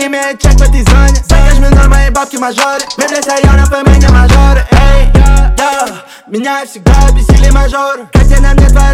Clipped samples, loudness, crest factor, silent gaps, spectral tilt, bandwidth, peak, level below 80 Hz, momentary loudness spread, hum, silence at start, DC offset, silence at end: 3%; -8 LUFS; 6 dB; none; -5.5 dB/octave; 14.5 kHz; 0 dBFS; -6 dBFS; 8 LU; none; 0 s; under 0.1%; 0 s